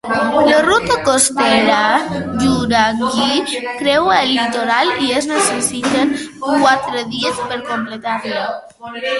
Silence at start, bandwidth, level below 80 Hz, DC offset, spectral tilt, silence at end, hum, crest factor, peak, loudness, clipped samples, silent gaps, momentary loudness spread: 0.05 s; 12 kHz; -46 dBFS; under 0.1%; -3 dB/octave; 0 s; none; 16 dB; 0 dBFS; -15 LUFS; under 0.1%; none; 10 LU